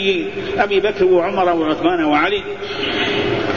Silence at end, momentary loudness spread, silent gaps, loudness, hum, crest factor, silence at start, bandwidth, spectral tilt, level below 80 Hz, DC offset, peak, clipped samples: 0 s; 7 LU; none; -17 LUFS; none; 16 dB; 0 s; 7.2 kHz; -5.5 dB/octave; -46 dBFS; 0.9%; -2 dBFS; under 0.1%